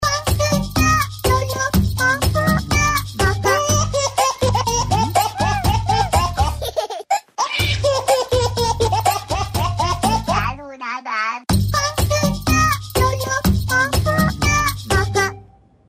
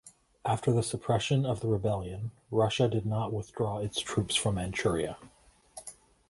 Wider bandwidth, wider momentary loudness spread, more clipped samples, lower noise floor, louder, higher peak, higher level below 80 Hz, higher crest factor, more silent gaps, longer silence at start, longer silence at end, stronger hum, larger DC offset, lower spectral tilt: first, 16 kHz vs 11.5 kHz; second, 5 LU vs 15 LU; neither; second, -46 dBFS vs -52 dBFS; first, -18 LUFS vs -31 LUFS; first, -4 dBFS vs -12 dBFS; first, -28 dBFS vs -52 dBFS; about the same, 14 dB vs 18 dB; neither; about the same, 0 s vs 0.05 s; about the same, 0.45 s vs 0.4 s; neither; neither; about the same, -4 dB/octave vs -5 dB/octave